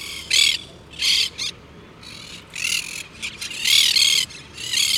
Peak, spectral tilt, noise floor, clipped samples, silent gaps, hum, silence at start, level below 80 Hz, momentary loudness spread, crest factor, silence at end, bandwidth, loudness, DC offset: -2 dBFS; 1.5 dB/octave; -43 dBFS; under 0.1%; none; none; 0 s; -54 dBFS; 22 LU; 20 dB; 0 s; 19.5 kHz; -18 LUFS; under 0.1%